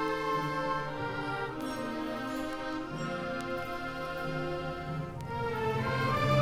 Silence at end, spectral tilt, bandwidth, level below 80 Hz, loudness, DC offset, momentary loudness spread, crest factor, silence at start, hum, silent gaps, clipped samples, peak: 0 s; -6 dB/octave; 16.5 kHz; -54 dBFS; -34 LUFS; under 0.1%; 6 LU; 18 dB; 0 s; none; none; under 0.1%; -14 dBFS